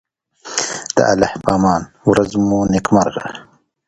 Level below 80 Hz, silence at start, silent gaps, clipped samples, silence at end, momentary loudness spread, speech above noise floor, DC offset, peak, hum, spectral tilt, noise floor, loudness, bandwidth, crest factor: -42 dBFS; 0.45 s; none; under 0.1%; 0.45 s; 9 LU; 22 dB; under 0.1%; 0 dBFS; none; -5 dB/octave; -37 dBFS; -16 LUFS; 11 kHz; 16 dB